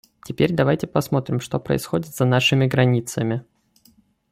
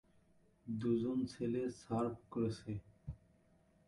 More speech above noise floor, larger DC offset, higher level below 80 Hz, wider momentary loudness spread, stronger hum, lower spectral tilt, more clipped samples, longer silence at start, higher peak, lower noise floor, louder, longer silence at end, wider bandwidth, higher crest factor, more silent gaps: first, 38 dB vs 32 dB; neither; first, -54 dBFS vs -64 dBFS; second, 8 LU vs 17 LU; neither; second, -6 dB/octave vs -8 dB/octave; neither; second, 0.25 s vs 0.65 s; first, -4 dBFS vs -24 dBFS; second, -58 dBFS vs -71 dBFS; first, -21 LUFS vs -40 LUFS; first, 0.9 s vs 0.7 s; first, 16 kHz vs 11.5 kHz; about the same, 18 dB vs 16 dB; neither